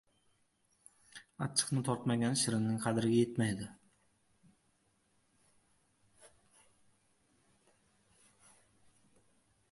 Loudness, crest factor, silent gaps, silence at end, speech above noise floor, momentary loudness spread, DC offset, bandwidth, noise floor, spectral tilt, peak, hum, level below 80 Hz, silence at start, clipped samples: -34 LUFS; 24 dB; none; 3.45 s; 42 dB; 19 LU; under 0.1%; 11.5 kHz; -75 dBFS; -4.5 dB/octave; -14 dBFS; none; -72 dBFS; 1.15 s; under 0.1%